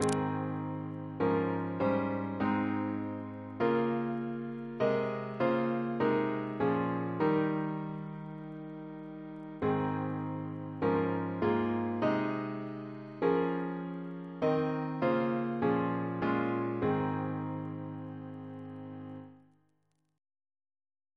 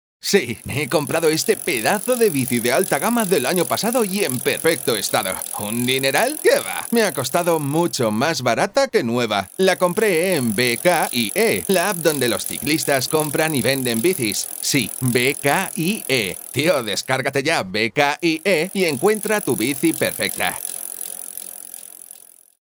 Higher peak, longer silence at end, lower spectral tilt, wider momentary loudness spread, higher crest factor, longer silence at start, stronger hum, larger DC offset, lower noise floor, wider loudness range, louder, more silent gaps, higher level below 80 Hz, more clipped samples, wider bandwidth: second, -14 dBFS vs 0 dBFS; first, 1.8 s vs 0.45 s; first, -7.5 dB/octave vs -3.5 dB/octave; first, 14 LU vs 5 LU; about the same, 20 dB vs 20 dB; second, 0 s vs 0.25 s; neither; neither; first, -77 dBFS vs -45 dBFS; first, 5 LU vs 1 LU; second, -33 LUFS vs -19 LUFS; neither; second, -68 dBFS vs -60 dBFS; neither; second, 11 kHz vs over 20 kHz